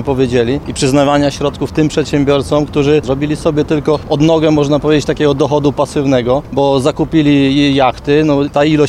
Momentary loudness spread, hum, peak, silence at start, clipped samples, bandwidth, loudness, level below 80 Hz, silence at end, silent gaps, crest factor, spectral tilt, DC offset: 4 LU; none; 0 dBFS; 0 s; under 0.1%; 12 kHz; -12 LUFS; -34 dBFS; 0 s; none; 12 dB; -6 dB/octave; 0.1%